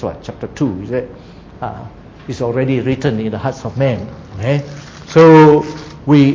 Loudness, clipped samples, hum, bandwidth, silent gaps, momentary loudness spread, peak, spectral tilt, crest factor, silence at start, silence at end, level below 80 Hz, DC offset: -13 LUFS; 0.2%; none; 7.6 kHz; none; 22 LU; 0 dBFS; -8 dB/octave; 14 dB; 0 s; 0 s; -42 dBFS; under 0.1%